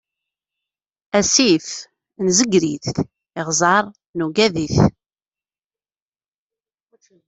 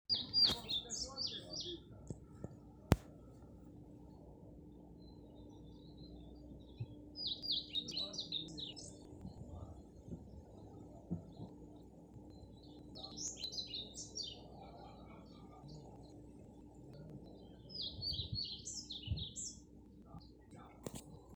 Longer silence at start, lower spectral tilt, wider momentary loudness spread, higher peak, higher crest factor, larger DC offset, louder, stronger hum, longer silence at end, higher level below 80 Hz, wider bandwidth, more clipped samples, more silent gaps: first, 1.15 s vs 0.1 s; about the same, -3.5 dB/octave vs -3.5 dB/octave; second, 14 LU vs 20 LU; first, 0 dBFS vs -10 dBFS; second, 20 dB vs 36 dB; neither; first, -18 LUFS vs -41 LUFS; neither; first, 2.35 s vs 0 s; first, -48 dBFS vs -58 dBFS; second, 8.4 kHz vs over 20 kHz; neither; first, 4.09-4.14 s vs none